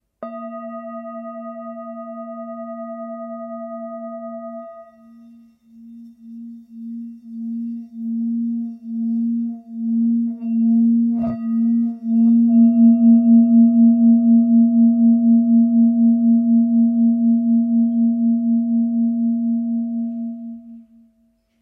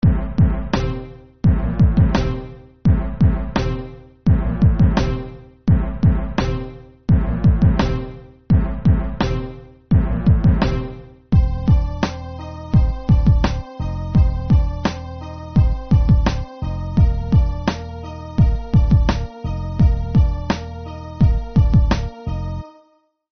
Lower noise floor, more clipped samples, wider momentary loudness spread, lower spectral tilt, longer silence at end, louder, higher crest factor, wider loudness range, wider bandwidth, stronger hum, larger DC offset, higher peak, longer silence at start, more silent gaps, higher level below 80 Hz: first, -62 dBFS vs -58 dBFS; neither; first, 20 LU vs 14 LU; first, -13 dB/octave vs -8 dB/octave; first, 0.8 s vs 0.65 s; first, -16 LUFS vs -19 LUFS; about the same, 12 dB vs 14 dB; first, 20 LU vs 1 LU; second, 2.1 kHz vs 6.4 kHz; neither; neither; about the same, -6 dBFS vs -4 dBFS; first, 0.2 s vs 0.05 s; neither; second, -68 dBFS vs -22 dBFS